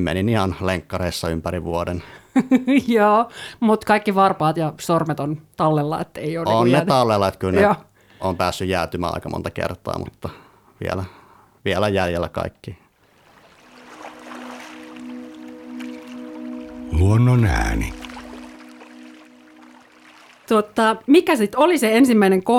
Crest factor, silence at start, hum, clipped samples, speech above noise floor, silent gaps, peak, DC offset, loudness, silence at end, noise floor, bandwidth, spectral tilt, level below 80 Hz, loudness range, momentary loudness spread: 18 dB; 0 s; none; under 0.1%; 36 dB; none; -2 dBFS; under 0.1%; -19 LUFS; 0 s; -55 dBFS; 17.5 kHz; -6.5 dB/octave; -38 dBFS; 13 LU; 20 LU